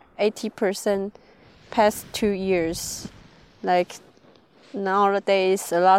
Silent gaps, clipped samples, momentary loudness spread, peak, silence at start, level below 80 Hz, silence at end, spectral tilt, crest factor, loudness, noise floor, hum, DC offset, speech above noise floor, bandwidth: none; under 0.1%; 13 LU; -6 dBFS; 0.2 s; -54 dBFS; 0 s; -4 dB/octave; 18 dB; -23 LUFS; -55 dBFS; none; under 0.1%; 32 dB; 16.5 kHz